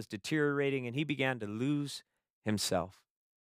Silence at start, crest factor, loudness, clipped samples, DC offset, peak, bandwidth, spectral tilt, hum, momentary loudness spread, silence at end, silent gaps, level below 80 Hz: 0 s; 20 dB; -34 LUFS; under 0.1%; under 0.1%; -16 dBFS; 15.5 kHz; -5 dB/octave; none; 10 LU; 0.65 s; 2.30-2.42 s; -74 dBFS